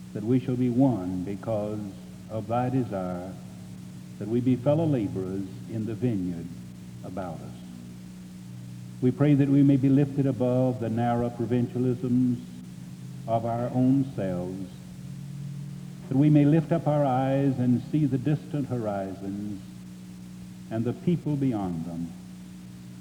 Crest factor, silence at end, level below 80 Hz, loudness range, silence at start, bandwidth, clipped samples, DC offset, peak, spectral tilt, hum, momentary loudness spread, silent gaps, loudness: 18 dB; 0 s; -58 dBFS; 7 LU; 0 s; 13.5 kHz; under 0.1%; under 0.1%; -10 dBFS; -9 dB/octave; 60 Hz at -55 dBFS; 20 LU; none; -26 LUFS